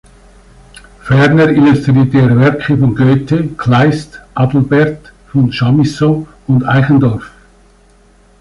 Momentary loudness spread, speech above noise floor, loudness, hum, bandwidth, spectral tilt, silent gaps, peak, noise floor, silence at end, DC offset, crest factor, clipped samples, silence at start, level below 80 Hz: 9 LU; 36 dB; -11 LUFS; none; 11 kHz; -8 dB/octave; none; 0 dBFS; -46 dBFS; 1.15 s; under 0.1%; 10 dB; under 0.1%; 1.05 s; -40 dBFS